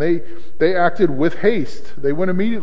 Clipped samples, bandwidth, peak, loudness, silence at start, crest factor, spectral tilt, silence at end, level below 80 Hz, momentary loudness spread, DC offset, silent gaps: under 0.1%; 7.8 kHz; -2 dBFS; -19 LUFS; 0 s; 16 dB; -8 dB/octave; 0 s; -50 dBFS; 8 LU; 10%; none